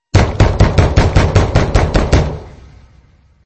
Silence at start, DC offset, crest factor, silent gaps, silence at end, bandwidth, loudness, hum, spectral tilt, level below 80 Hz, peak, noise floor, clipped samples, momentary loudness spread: 0.15 s; under 0.1%; 12 dB; none; 0.95 s; 8.6 kHz; -13 LUFS; none; -6.5 dB/octave; -18 dBFS; 0 dBFS; -48 dBFS; under 0.1%; 4 LU